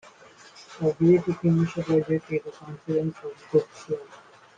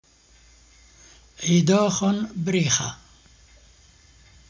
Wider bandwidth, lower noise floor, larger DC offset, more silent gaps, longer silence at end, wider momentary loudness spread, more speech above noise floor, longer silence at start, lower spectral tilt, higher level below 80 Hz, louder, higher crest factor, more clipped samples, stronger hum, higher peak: about the same, 7.6 kHz vs 7.6 kHz; second, -51 dBFS vs -55 dBFS; neither; neither; second, 0.4 s vs 1.55 s; first, 16 LU vs 12 LU; second, 26 dB vs 34 dB; second, 0.6 s vs 1.4 s; first, -8.5 dB/octave vs -4.5 dB/octave; second, -62 dBFS vs -56 dBFS; second, -25 LUFS vs -22 LUFS; about the same, 18 dB vs 18 dB; neither; neither; about the same, -8 dBFS vs -8 dBFS